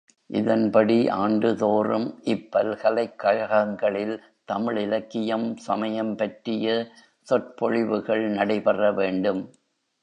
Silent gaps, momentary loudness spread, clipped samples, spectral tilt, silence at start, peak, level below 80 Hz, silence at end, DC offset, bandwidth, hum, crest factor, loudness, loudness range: none; 7 LU; under 0.1%; -7 dB/octave; 0.3 s; -6 dBFS; -68 dBFS; 0.55 s; under 0.1%; 9.2 kHz; none; 18 dB; -24 LUFS; 4 LU